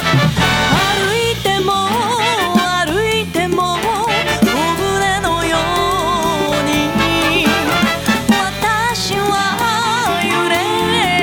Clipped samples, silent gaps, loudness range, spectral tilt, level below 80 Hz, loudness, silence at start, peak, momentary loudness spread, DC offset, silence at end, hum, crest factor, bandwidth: under 0.1%; none; 1 LU; -4 dB/octave; -36 dBFS; -14 LUFS; 0 s; -2 dBFS; 3 LU; under 0.1%; 0 s; none; 14 dB; over 20 kHz